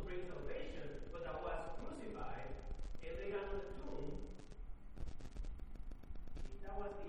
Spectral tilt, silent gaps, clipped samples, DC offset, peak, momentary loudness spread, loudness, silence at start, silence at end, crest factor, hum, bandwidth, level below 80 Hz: -6.5 dB/octave; none; under 0.1%; under 0.1%; -30 dBFS; 11 LU; -50 LUFS; 0 s; 0 s; 14 dB; none; 9.6 kHz; -50 dBFS